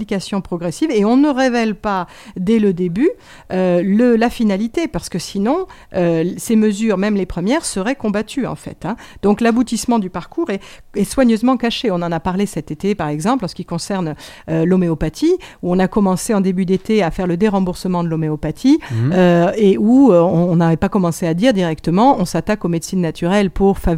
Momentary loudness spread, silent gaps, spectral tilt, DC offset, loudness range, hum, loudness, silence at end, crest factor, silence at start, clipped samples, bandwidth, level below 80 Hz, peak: 10 LU; none; -6.5 dB/octave; under 0.1%; 5 LU; none; -16 LUFS; 0 s; 16 dB; 0 s; under 0.1%; 16 kHz; -38 dBFS; 0 dBFS